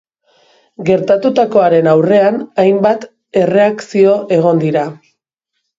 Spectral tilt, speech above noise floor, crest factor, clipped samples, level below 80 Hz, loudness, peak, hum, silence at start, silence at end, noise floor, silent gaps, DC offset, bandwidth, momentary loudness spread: -7.5 dB/octave; 61 dB; 12 dB; under 0.1%; -56 dBFS; -12 LUFS; 0 dBFS; none; 0.8 s; 0.85 s; -73 dBFS; none; under 0.1%; 7.8 kHz; 8 LU